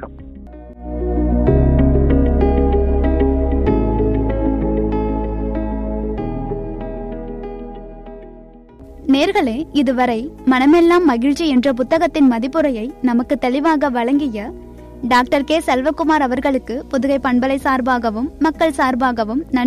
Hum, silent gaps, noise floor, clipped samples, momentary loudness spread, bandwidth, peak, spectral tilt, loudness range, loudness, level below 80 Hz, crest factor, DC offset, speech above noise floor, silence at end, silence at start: none; none; -40 dBFS; under 0.1%; 15 LU; 13 kHz; -2 dBFS; -7 dB/octave; 8 LU; -17 LUFS; -24 dBFS; 14 dB; under 0.1%; 24 dB; 0 s; 0 s